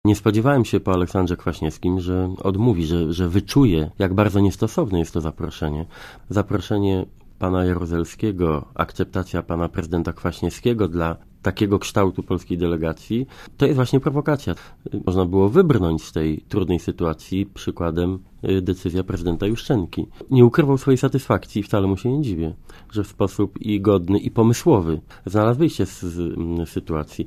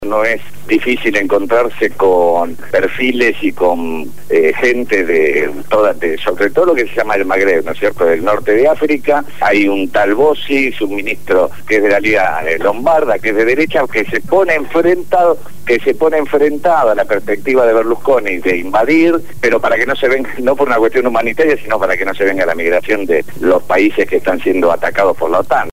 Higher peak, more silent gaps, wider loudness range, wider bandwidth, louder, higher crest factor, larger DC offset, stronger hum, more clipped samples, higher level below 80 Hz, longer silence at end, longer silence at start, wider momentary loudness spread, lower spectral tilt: about the same, 0 dBFS vs -2 dBFS; neither; first, 4 LU vs 1 LU; about the same, 15.5 kHz vs 16 kHz; second, -21 LUFS vs -13 LUFS; first, 20 dB vs 12 dB; second, under 0.1% vs 9%; second, none vs 50 Hz at -45 dBFS; neither; first, -36 dBFS vs -50 dBFS; about the same, 0 s vs 0 s; about the same, 0.05 s vs 0 s; first, 10 LU vs 4 LU; first, -7.5 dB/octave vs -5 dB/octave